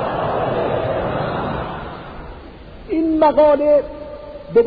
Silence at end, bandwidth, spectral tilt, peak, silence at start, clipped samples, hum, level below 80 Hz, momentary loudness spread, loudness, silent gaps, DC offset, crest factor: 0 s; 5 kHz; -10 dB/octave; -4 dBFS; 0 s; under 0.1%; none; -40 dBFS; 22 LU; -18 LUFS; none; under 0.1%; 16 dB